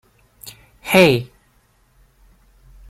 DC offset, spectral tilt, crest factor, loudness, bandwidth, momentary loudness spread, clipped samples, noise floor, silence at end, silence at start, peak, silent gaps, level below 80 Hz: under 0.1%; -5 dB/octave; 22 dB; -15 LUFS; 16 kHz; 26 LU; under 0.1%; -58 dBFS; 1.65 s; 0.45 s; 0 dBFS; none; -52 dBFS